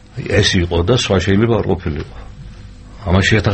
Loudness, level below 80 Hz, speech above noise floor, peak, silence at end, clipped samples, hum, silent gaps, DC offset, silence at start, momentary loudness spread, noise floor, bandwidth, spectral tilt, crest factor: -15 LUFS; -30 dBFS; 20 dB; 0 dBFS; 0 s; under 0.1%; none; none; under 0.1%; 0.15 s; 20 LU; -35 dBFS; 8.8 kHz; -5.5 dB/octave; 16 dB